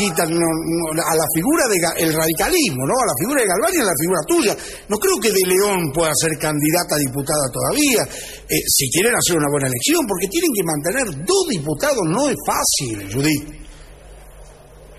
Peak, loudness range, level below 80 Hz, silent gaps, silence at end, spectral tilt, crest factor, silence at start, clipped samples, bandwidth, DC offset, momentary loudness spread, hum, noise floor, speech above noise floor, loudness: -4 dBFS; 2 LU; -44 dBFS; none; 0 s; -3.5 dB/octave; 14 dB; 0 s; under 0.1%; 13.5 kHz; 0.1%; 5 LU; none; -42 dBFS; 24 dB; -17 LUFS